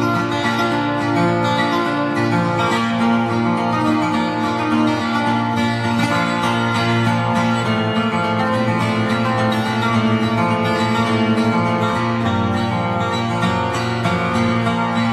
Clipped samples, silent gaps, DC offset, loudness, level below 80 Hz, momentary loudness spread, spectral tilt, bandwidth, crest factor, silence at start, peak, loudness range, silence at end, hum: under 0.1%; none; under 0.1%; -18 LUFS; -50 dBFS; 2 LU; -6 dB/octave; 12.5 kHz; 14 dB; 0 s; -4 dBFS; 1 LU; 0 s; none